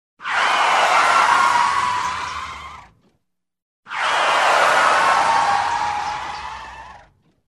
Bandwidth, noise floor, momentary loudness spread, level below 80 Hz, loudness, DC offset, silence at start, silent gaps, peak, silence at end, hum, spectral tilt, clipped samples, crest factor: 13 kHz; -72 dBFS; 17 LU; -54 dBFS; -17 LUFS; under 0.1%; 0.2 s; 3.62-3.83 s; -2 dBFS; 0.5 s; none; -1 dB/octave; under 0.1%; 18 dB